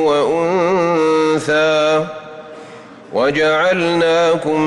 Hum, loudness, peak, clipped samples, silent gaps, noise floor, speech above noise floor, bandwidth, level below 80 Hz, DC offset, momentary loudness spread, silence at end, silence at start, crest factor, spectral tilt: none; -15 LUFS; -6 dBFS; under 0.1%; none; -36 dBFS; 22 dB; 11.5 kHz; -56 dBFS; under 0.1%; 18 LU; 0 s; 0 s; 10 dB; -5 dB/octave